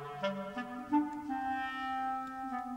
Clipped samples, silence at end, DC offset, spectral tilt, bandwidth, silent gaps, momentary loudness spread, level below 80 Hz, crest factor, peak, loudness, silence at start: under 0.1%; 0 s; under 0.1%; -6 dB/octave; 15.5 kHz; none; 7 LU; -68 dBFS; 16 dB; -20 dBFS; -37 LUFS; 0 s